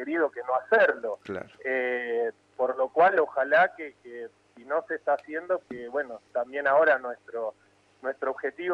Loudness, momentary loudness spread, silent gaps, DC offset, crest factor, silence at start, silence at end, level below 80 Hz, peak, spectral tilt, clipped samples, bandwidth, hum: -27 LUFS; 15 LU; none; under 0.1%; 18 dB; 0 s; 0 s; -76 dBFS; -10 dBFS; -6 dB/octave; under 0.1%; 7.6 kHz; none